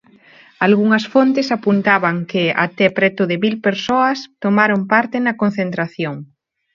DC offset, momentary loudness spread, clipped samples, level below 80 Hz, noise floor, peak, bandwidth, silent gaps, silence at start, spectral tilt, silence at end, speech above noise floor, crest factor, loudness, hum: under 0.1%; 8 LU; under 0.1%; -62 dBFS; -47 dBFS; 0 dBFS; 7.2 kHz; none; 0.6 s; -6.5 dB/octave; 0.5 s; 31 dB; 16 dB; -16 LUFS; none